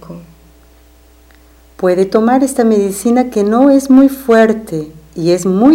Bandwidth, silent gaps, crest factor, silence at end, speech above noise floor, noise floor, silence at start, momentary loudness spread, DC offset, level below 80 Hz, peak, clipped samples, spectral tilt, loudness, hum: 16.5 kHz; none; 12 dB; 0 s; 34 dB; -44 dBFS; 0.1 s; 10 LU; under 0.1%; -44 dBFS; 0 dBFS; under 0.1%; -6 dB/octave; -11 LUFS; none